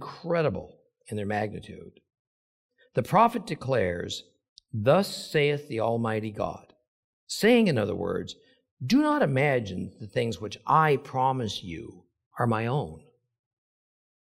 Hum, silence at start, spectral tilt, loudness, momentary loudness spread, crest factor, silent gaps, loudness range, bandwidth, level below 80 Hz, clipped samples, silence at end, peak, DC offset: none; 0 s; -6 dB/octave; -27 LUFS; 17 LU; 20 dB; 2.19-2.69 s, 4.49-4.56 s, 6.88-7.27 s, 8.71-8.77 s, 12.26-12.31 s; 3 LU; 16 kHz; -62 dBFS; under 0.1%; 1.2 s; -8 dBFS; under 0.1%